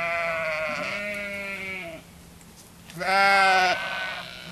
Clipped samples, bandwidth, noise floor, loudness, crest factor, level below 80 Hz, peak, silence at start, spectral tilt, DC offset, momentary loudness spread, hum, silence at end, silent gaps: under 0.1%; 14 kHz; -48 dBFS; -24 LUFS; 18 dB; -58 dBFS; -8 dBFS; 0 s; -2.5 dB/octave; under 0.1%; 17 LU; none; 0 s; none